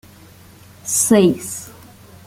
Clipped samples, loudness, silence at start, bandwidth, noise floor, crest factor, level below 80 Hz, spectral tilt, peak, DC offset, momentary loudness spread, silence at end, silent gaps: under 0.1%; -16 LUFS; 0.85 s; 16.5 kHz; -44 dBFS; 18 dB; -54 dBFS; -4.5 dB/octave; -2 dBFS; under 0.1%; 19 LU; 0.55 s; none